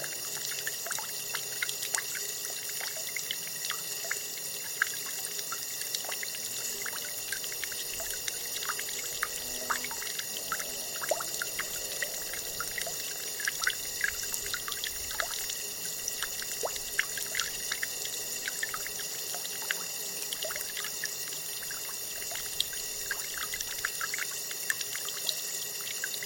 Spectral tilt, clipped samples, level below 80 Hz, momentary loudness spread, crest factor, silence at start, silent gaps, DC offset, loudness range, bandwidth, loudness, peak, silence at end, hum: 1 dB/octave; under 0.1%; -64 dBFS; 3 LU; 30 dB; 0 s; none; under 0.1%; 1 LU; 17 kHz; -32 LUFS; -4 dBFS; 0 s; none